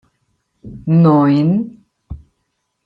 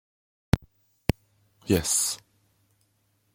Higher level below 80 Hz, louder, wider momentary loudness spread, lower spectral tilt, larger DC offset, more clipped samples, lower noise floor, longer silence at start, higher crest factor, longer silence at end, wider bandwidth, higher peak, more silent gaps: about the same, -44 dBFS vs -44 dBFS; first, -13 LUFS vs -27 LUFS; first, 25 LU vs 16 LU; first, -11 dB/octave vs -4 dB/octave; neither; neither; about the same, -70 dBFS vs -70 dBFS; about the same, 0.65 s vs 0.55 s; second, 14 dB vs 28 dB; second, 0.7 s vs 1.2 s; second, 5 kHz vs 16.5 kHz; about the same, -2 dBFS vs -2 dBFS; neither